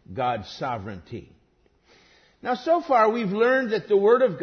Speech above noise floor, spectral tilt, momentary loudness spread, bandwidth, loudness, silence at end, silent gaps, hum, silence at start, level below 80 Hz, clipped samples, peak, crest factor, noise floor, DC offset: 41 dB; -6.5 dB/octave; 17 LU; 6.6 kHz; -23 LUFS; 0 s; none; none; 0.1 s; -62 dBFS; under 0.1%; -6 dBFS; 18 dB; -63 dBFS; under 0.1%